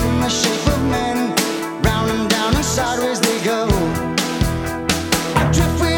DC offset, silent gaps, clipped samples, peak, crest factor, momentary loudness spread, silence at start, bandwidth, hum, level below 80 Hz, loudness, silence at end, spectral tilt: under 0.1%; none; under 0.1%; 0 dBFS; 16 dB; 3 LU; 0 s; over 20 kHz; none; -28 dBFS; -18 LUFS; 0 s; -4.5 dB/octave